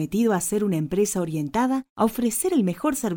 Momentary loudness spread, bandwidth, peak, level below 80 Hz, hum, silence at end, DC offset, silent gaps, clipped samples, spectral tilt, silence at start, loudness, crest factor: 3 LU; 17 kHz; -8 dBFS; -52 dBFS; none; 0 s; under 0.1%; 1.90-1.96 s; under 0.1%; -5.5 dB/octave; 0 s; -23 LUFS; 14 dB